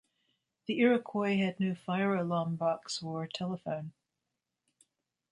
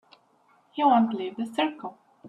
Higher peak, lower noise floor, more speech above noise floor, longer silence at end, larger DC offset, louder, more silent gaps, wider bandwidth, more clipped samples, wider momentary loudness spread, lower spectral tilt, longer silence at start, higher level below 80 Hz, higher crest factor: second, -14 dBFS vs -10 dBFS; first, -87 dBFS vs -63 dBFS; first, 55 dB vs 38 dB; first, 1.4 s vs 0 s; neither; second, -32 LUFS vs -25 LUFS; neither; about the same, 11 kHz vs 11.5 kHz; neither; second, 11 LU vs 19 LU; about the same, -6 dB/octave vs -6 dB/octave; about the same, 0.7 s vs 0.75 s; about the same, -76 dBFS vs -78 dBFS; about the same, 20 dB vs 18 dB